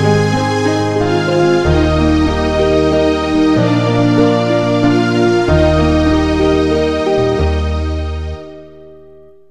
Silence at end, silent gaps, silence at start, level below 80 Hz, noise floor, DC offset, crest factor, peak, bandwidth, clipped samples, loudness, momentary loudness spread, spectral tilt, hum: 0.55 s; none; 0 s; -24 dBFS; -41 dBFS; 0.7%; 12 dB; 0 dBFS; 10.5 kHz; under 0.1%; -13 LUFS; 6 LU; -7 dB/octave; none